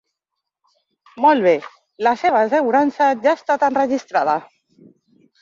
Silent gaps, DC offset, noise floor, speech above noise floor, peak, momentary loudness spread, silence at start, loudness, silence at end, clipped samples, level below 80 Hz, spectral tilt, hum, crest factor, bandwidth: none; under 0.1%; -81 dBFS; 64 dB; -2 dBFS; 5 LU; 1.15 s; -17 LUFS; 1 s; under 0.1%; -68 dBFS; -5 dB/octave; none; 16 dB; 7.4 kHz